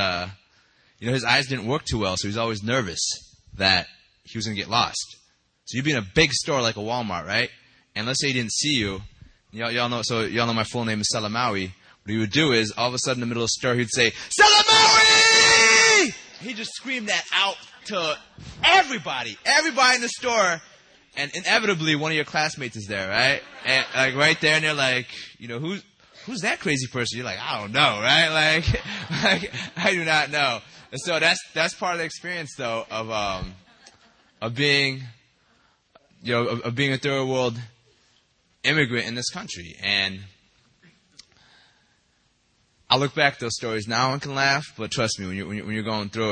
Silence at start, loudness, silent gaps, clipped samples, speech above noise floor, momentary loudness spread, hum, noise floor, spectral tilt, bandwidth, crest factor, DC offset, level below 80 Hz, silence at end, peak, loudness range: 0 s; -21 LUFS; none; under 0.1%; 43 dB; 15 LU; none; -66 dBFS; -2.5 dB/octave; 10 kHz; 22 dB; under 0.1%; -50 dBFS; 0 s; -2 dBFS; 11 LU